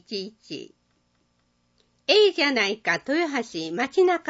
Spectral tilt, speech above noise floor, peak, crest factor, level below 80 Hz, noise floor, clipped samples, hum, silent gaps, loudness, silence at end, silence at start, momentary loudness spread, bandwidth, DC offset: -3 dB/octave; 45 dB; -6 dBFS; 18 dB; -74 dBFS; -69 dBFS; under 0.1%; none; none; -23 LUFS; 0 s; 0.1 s; 19 LU; 8 kHz; under 0.1%